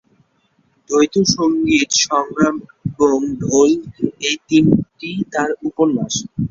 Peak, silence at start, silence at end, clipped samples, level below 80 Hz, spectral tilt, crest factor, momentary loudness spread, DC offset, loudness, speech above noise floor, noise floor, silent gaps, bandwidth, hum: 0 dBFS; 0.9 s; 0.05 s; under 0.1%; -48 dBFS; -4 dB/octave; 16 dB; 8 LU; under 0.1%; -17 LUFS; 45 dB; -61 dBFS; none; 7.6 kHz; none